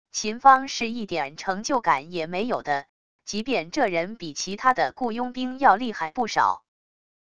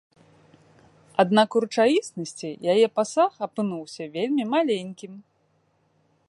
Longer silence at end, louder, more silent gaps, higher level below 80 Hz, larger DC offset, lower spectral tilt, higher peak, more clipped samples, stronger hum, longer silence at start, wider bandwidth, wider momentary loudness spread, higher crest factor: second, 0.65 s vs 1.1 s; about the same, -24 LUFS vs -24 LUFS; first, 2.89-3.19 s vs none; first, -60 dBFS vs -76 dBFS; first, 0.5% vs under 0.1%; second, -3 dB/octave vs -5 dB/octave; first, -2 dBFS vs -6 dBFS; neither; neither; second, 0.05 s vs 1.2 s; about the same, 10.5 kHz vs 11.5 kHz; second, 11 LU vs 14 LU; about the same, 22 dB vs 20 dB